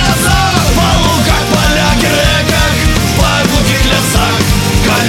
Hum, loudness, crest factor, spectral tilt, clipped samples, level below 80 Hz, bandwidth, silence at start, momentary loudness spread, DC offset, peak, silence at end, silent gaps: none; -10 LUFS; 10 dB; -4 dB/octave; under 0.1%; -18 dBFS; 17 kHz; 0 s; 1 LU; under 0.1%; 0 dBFS; 0 s; none